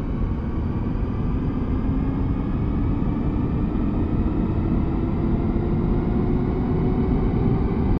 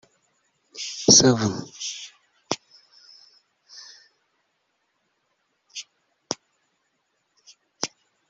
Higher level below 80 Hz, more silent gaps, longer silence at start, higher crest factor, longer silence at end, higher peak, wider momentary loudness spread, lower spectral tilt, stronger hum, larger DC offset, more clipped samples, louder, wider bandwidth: first, -26 dBFS vs -64 dBFS; neither; second, 0 s vs 0.75 s; second, 14 dB vs 26 dB; second, 0 s vs 0.4 s; second, -8 dBFS vs -2 dBFS; second, 4 LU vs 29 LU; first, -11 dB/octave vs -2.5 dB/octave; neither; neither; neither; about the same, -23 LUFS vs -21 LUFS; second, 5.2 kHz vs 8 kHz